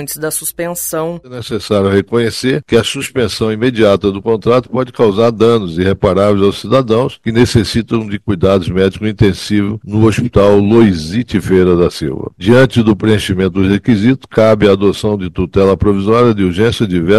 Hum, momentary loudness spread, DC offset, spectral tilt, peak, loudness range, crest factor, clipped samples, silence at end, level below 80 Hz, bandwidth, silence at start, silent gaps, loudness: none; 8 LU; 0.4%; -6 dB/octave; 0 dBFS; 2 LU; 12 dB; under 0.1%; 0 s; -34 dBFS; 16 kHz; 0 s; none; -12 LUFS